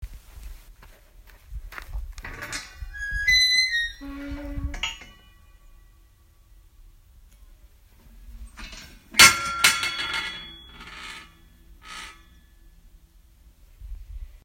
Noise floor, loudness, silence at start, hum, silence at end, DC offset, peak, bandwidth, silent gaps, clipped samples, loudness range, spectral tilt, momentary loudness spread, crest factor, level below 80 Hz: -55 dBFS; -20 LUFS; 0 s; none; 0.05 s; under 0.1%; 0 dBFS; 16 kHz; none; under 0.1%; 19 LU; 0 dB/octave; 27 LU; 28 dB; -42 dBFS